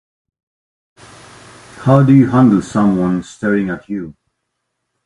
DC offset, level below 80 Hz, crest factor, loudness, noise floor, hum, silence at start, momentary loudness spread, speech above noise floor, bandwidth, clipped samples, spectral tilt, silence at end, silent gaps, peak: under 0.1%; -48 dBFS; 16 dB; -13 LUFS; -73 dBFS; none; 1.75 s; 16 LU; 60 dB; 11 kHz; under 0.1%; -8.5 dB/octave; 0.95 s; none; 0 dBFS